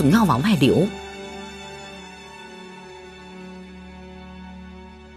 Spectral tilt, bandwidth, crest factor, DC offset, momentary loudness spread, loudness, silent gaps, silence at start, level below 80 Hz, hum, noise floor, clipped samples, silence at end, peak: -6.5 dB/octave; 14.5 kHz; 20 dB; under 0.1%; 23 LU; -20 LUFS; none; 0 s; -48 dBFS; none; -41 dBFS; under 0.1%; 0.3 s; -4 dBFS